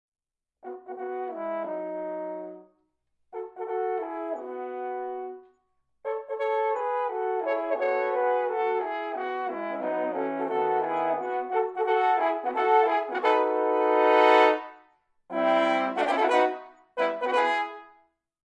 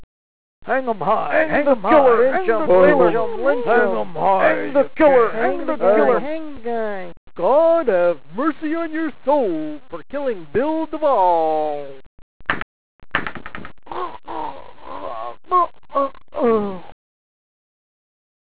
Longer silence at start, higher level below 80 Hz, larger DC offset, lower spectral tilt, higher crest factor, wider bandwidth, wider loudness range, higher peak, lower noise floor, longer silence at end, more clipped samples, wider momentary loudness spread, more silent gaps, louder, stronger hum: first, 0.65 s vs 0 s; second, -84 dBFS vs -52 dBFS; second, under 0.1% vs 3%; second, -4.5 dB/octave vs -9.5 dB/octave; about the same, 20 dB vs 16 dB; first, 9.8 kHz vs 4 kHz; about the same, 12 LU vs 10 LU; second, -6 dBFS vs -2 dBFS; second, -73 dBFS vs under -90 dBFS; second, 0.65 s vs 1.65 s; neither; about the same, 15 LU vs 17 LU; second, none vs 0.04-0.62 s, 7.17-7.27 s, 12.06-12.40 s, 12.62-12.99 s; second, -26 LUFS vs -18 LUFS; neither